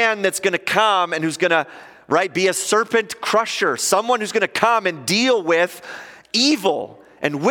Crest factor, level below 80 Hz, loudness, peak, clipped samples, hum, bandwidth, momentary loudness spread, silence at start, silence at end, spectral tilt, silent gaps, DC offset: 20 dB; -70 dBFS; -18 LUFS; 0 dBFS; under 0.1%; none; 17 kHz; 8 LU; 0 s; 0 s; -2.5 dB/octave; none; under 0.1%